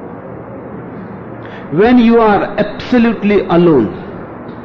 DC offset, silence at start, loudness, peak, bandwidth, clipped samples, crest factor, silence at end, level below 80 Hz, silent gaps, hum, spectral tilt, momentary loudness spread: under 0.1%; 0 s; -11 LUFS; -2 dBFS; 6.2 kHz; under 0.1%; 12 dB; 0 s; -40 dBFS; none; none; -8.5 dB/octave; 20 LU